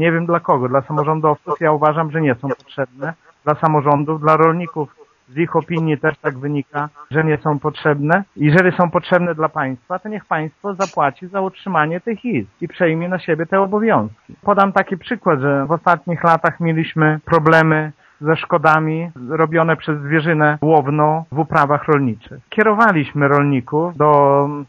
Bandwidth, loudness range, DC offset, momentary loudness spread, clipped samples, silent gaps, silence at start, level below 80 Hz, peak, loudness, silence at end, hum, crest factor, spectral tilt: 7.4 kHz; 4 LU; under 0.1%; 11 LU; under 0.1%; none; 0 s; -56 dBFS; 0 dBFS; -17 LUFS; 0.05 s; none; 16 dB; -8 dB/octave